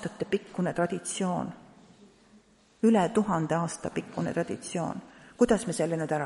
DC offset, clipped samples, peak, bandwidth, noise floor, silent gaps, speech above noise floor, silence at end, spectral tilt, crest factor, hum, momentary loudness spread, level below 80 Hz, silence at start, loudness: under 0.1%; under 0.1%; -10 dBFS; 11.5 kHz; -60 dBFS; none; 31 dB; 0 s; -5.5 dB/octave; 20 dB; none; 10 LU; -60 dBFS; 0 s; -29 LUFS